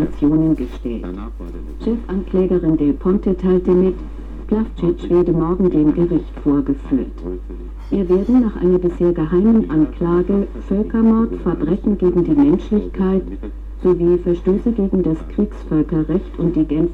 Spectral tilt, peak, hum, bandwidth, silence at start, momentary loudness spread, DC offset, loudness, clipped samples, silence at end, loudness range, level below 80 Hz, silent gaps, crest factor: -10.5 dB/octave; -6 dBFS; none; 4.5 kHz; 0 s; 12 LU; under 0.1%; -17 LUFS; under 0.1%; 0 s; 2 LU; -30 dBFS; none; 12 dB